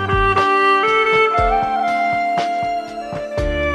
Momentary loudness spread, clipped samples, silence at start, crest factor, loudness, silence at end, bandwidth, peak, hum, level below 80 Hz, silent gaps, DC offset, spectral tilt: 11 LU; under 0.1%; 0 s; 14 dB; -16 LUFS; 0 s; 12 kHz; -4 dBFS; none; -30 dBFS; none; under 0.1%; -5.5 dB/octave